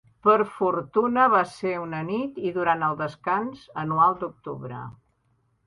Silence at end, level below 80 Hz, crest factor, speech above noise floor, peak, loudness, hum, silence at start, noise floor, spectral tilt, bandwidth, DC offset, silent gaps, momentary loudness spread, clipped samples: 0.75 s; -64 dBFS; 20 dB; 44 dB; -6 dBFS; -24 LUFS; none; 0.25 s; -68 dBFS; -7.5 dB/octave; 11 kHz; under 0.1%; none; 15 LU; under 0.1%